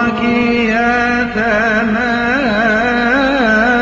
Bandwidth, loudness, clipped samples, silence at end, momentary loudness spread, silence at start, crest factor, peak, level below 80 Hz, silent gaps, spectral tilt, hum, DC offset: 7.6 kHz; -13 LUFS; under 0.1%; 0 s; 3 LU; 0 s; 12 dB; -2 dBFS; -36 dBFS; none; -5.5 dB/octave; none; under 0.1%